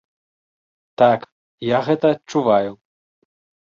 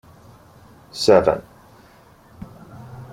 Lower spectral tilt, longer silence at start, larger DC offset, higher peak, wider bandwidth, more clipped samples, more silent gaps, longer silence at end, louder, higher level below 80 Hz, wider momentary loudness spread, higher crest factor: first, -6.5 dB/octave vs -5 dB/octave; about the same, 1 s vs 0.95 s; neither; about the same, -2 dBFS vs -2 dBFS; second, 7.4 kHz vs 15.5 kHz; neither; first, 1.32-1.58 s vs none; first, 0.95 s vs 0.1 s; about the same, -19 LUFS vs -17 LUFS; second, -62 dBFS vs -52 dBFS; second, 8 LU vs 26 LU; about the same, 18 dB vs 22 dB